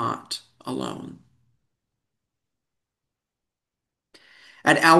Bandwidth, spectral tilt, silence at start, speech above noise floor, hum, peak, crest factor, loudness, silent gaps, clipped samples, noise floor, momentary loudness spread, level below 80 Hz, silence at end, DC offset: 12.5 kHz; -4 dB/octave; 0 s; 66 dB; none; -2 dBFS; 24 dB; -26 LUFS; none; under 0.1%; -86 dBFS; 18 LU; -70 dBFS; 0 s; under 0.1%